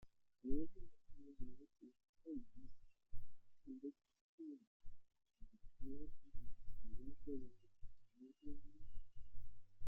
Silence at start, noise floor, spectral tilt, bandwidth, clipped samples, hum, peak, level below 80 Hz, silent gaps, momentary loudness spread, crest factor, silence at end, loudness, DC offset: 0 s; -62 dBFS; -10 dB/octave; 0.6 kHz; under 0.1%; none; -26 dBFS; -58 dBFS; 2.09-2.13 s, 4.21-4.38 s, 4.67-4.80 s; 15 LU; 18 dB; 0 s; -57 LUFS; under 0.1%